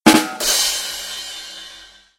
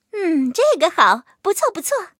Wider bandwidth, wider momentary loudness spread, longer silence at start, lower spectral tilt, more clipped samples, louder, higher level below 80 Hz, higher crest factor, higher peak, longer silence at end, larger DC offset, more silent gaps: about the same, 16.5 kHz vs 17 kHz; first, 18 LU vs 7 LU; about the same, 0.05 s vs 0.15 s; about the same, -1.5 dB/octave vs -2 dB/octave; neither; about the same, -18 LUFS vs -18 LUFS; first, -50 dBFS vs -76 dBFS; about the same, 20 dB vs 18 dB; about the same, 0 dBFS vs 0 dBFS; first, 0.35 s vs 0.1 s; neither; neither